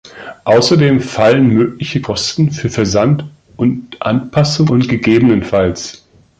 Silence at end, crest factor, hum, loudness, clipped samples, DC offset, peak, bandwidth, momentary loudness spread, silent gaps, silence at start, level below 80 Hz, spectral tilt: 0.45 s; 12 dB; none; -13 LUFS; under 0.1%; under 0.1%; 0 dBFS; 9 kHz; 10 LU; none; 0.05 s; -40 dBFS; -6 dB/octave